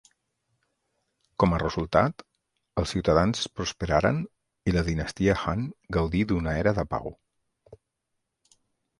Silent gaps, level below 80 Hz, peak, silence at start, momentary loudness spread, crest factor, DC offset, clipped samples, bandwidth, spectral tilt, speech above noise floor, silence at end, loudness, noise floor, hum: none; -42 dBFS; -4 dBFS; 1.4 s; 9 LU; 24 dB; under 0.1%; under 0.1%; 11.5 kHz; -6 dB/octave; 56 dB; 1.25 s; -26 LUFS; -81 dBFS; none